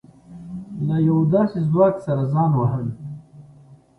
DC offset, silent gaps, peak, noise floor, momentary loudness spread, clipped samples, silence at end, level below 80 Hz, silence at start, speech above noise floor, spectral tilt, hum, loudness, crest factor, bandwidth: under 0.1%; none; -4 dBFS; -48 dBFS; 18 LU; under 0.1%; 0.25 s; -54 dBFS; 0.3 s; 30 dB; -11 dB/octave; none; -20 LUFS; 16 dB; 4.6 kHz